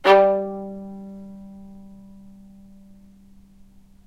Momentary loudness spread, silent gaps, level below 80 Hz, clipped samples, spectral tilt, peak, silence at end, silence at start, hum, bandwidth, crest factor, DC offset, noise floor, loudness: 30 LU; none; -56 dBFS; under 0.1%; -6 dB/octave; -2 dBFS; 2.35 s; 0.05 s; none; 8.8 kHz; 24 dB; under 0.1%; -49 dBFS; -20 LUFS